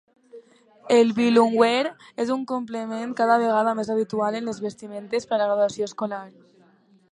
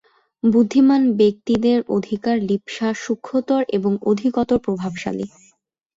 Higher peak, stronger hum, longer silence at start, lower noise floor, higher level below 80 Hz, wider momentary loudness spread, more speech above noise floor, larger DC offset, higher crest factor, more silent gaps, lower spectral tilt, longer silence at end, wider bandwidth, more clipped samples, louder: about the same, -4 dBFS vs -4 dBFS; neither; about the same, 0.35 s vs 0.45 s; about the same, -58 dBFS vs -61 dBFS; second, -72 dBFS vs -56 dBFS; about the same, 12 LU vs 10 LU; second, 35 dB vs 43 dB; neither; first, 20 dB vs 14 dB; neither; second, -5 dB/octave vs -6.5 dB/octave; first, 0.85 s vs 0.7 s; first, 11 kHz vs 7.8 kHz; neither; second, -23 LUFS vs -19 LUFS